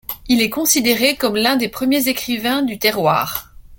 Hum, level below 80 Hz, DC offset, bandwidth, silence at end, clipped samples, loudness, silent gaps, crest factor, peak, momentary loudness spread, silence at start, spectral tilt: none; -48 dBFS; under 0.1%; 17 kHz; 0.05 s; under 0.1%; -16 LUFS; none; 18 dB; 0 dBFS; 5 LU; 0.1 s; -2.5 dB/octave